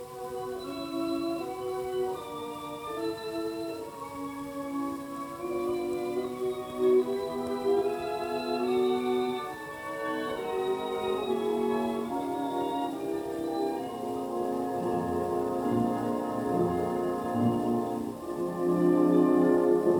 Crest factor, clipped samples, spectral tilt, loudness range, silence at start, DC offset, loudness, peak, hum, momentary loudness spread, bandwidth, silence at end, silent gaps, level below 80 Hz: 16 dB; under 0.1%; -6.5 dB/octave; 6 LU; 0 s; under 0.1%; -30 LUFS; -14 dBFS; none; 12 LU; 19.5 kHz; 0 s; none; -62 dBFS